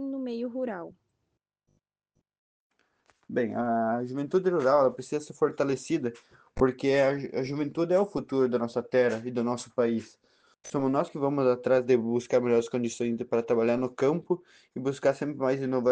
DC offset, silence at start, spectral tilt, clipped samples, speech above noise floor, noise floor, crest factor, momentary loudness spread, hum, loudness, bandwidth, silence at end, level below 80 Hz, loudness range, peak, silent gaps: under 0.1%; 0 s; -6.5 dB/octave; under 0.1%; 54 dB; -81 dBFS; 20 dB; 9 LU; none; -28 LUFS; 9.4 kHz; 0 s; -60 dBFS; 7 LU; -8 dBFS; 2.38-2.70 s